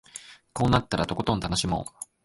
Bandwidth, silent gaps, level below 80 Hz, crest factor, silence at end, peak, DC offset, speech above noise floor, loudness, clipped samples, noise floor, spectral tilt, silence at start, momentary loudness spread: 12 kHz; none; -44 dBFS; 20 dB; 0.2 s; -8 dBFS; under 0.1%; 21 dB; -26 LUFS; under 0.1%; -47 dBFS; -5 dB/octave; 0.15 s; 16 LU